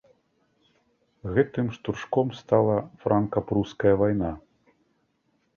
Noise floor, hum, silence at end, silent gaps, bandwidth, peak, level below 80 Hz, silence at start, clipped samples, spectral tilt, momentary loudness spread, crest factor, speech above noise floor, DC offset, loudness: -71 dBFS; none; 1.2 s; none; 7 kHz; -6 dBFS; -50 dBFS; 1.25 s; under 0.1%; -8.5 dB/octave; 9 LU; 20 dB; 46 dB; under 0.1%; -25 LUFS